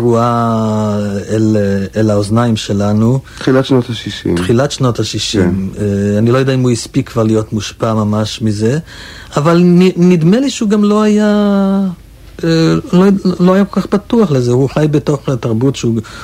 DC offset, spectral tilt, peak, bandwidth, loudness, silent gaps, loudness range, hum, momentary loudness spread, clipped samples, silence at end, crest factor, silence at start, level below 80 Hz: under 0.1%; -6.5 dB/octave; 0 dBFS; 14.5 kHz; -12 LUFS; none; 3 LU; none; 7 LU; under 0.1%; 0 s; 10 dB; 0 s; -40 dBFS